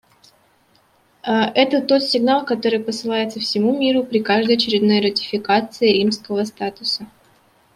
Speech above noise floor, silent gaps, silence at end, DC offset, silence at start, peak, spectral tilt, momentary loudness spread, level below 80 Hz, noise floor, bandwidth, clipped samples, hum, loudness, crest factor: 40 dB; none; 0.7 s; under 0.1%; 1.25 s; -2 dBFS; -5 dB/octave; 7 LU; -64 dBFS; -58 dBFS; 13.5 kHz; under 0.1%; none; -18 LUFS; 18 dB